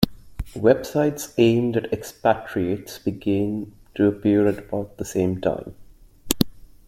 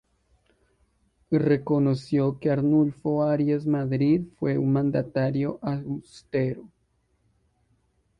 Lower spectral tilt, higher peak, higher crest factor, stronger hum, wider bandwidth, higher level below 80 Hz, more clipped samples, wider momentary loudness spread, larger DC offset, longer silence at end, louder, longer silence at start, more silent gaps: second, -6 dB/octave vs -9.5 dB/octave; first, 0 dBFS vs -10 dBFS; first, 22 dB vs 16 dB; neither; first, 16.5 kHz vs 9.6 kHz; first, -46 dBFS vs -60 dBFS; neither; first, 11 LU vs 8 LU; neither; second, 0.2 s vs 1.5 s; about the same, -23 LUFS vs -25 LUFS; second, 0 s vs 1.3 s; neither